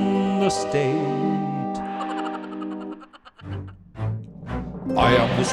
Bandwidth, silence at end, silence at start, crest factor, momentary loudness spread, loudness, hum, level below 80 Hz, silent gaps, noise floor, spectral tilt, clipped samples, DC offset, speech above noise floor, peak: 12 kHz; 0 s; 0 s; 20 dB; 17 LU; -24 LUFS; none; -44 dBFS; none; -45 dBFS; -5.5 dB/octave; under 0.1%; under 0.1%; 25 dB; -4 dBFS